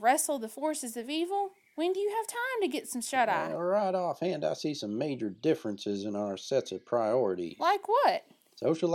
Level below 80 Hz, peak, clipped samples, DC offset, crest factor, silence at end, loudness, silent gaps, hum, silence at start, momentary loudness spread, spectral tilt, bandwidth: -82 dBFS; -12 dBFS; under 0.1%; under 0.1%; 18 dB; 0 s; -31 LUFS; none; none; 0 s; 8 LU; -4 dB/octave; 17.5 kHz